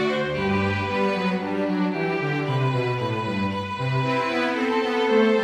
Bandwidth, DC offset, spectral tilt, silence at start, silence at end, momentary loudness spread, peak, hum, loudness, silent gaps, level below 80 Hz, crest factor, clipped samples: 11 kHz; under 0.1%; -7 dB/octave; 0 s; 0 s; 4 LU; -8 dBFS; none; -23 LUFS; none; -56 dBFS; 14 dB; under 0.1%